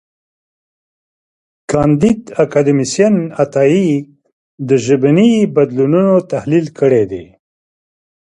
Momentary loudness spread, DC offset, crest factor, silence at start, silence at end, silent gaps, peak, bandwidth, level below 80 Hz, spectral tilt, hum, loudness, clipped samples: 7 LU; under 0.1%; 14 dB; 1.7 s; 1.15 s; 4.32-4.58 s; 0 dBFS; 11 kHz; -48 dBFS; -7 dB/octave; none; -13 LUFS; under 0.1%